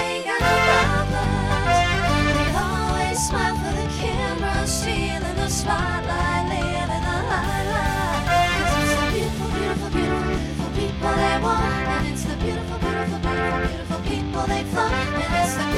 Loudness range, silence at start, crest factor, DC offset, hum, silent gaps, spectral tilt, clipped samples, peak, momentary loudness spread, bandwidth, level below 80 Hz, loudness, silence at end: 3 LU; 0 s; 18 dB; under 0.1%; none; none; -4.5 dB/octave; under 0.1%; -4 dBFS; 6 LU; 16.5 kHz; -30 dBFS; -22 LUFS; 0 s